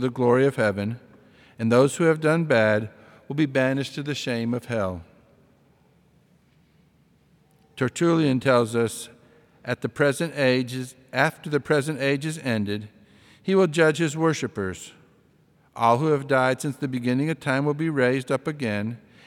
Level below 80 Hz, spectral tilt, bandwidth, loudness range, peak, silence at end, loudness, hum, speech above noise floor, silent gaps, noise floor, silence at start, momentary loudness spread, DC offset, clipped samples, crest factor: -68 dBFS; -6 dB/octave; 16.5 kHz; 7 LU; -4 dBFS; 0.3 s; -24 LUFS; none; 38 dB; none; -60 dBFS; 0 s; 12 LU; under 0.1%; under 0.1%; 20 dB